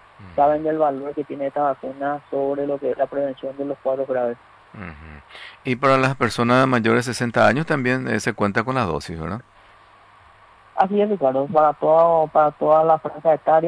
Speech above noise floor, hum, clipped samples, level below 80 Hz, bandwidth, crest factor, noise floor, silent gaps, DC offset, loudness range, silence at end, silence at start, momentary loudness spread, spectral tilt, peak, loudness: 30 dB; none; under 0.1%; -54 dBFS; 11 kHz; 16 dB; -50 dBFS; none; under 0.1%; 7 LU; 0 s; 0.2 s; 14 LU; -6 dB/octave; -4 dBFS; -20 LUFS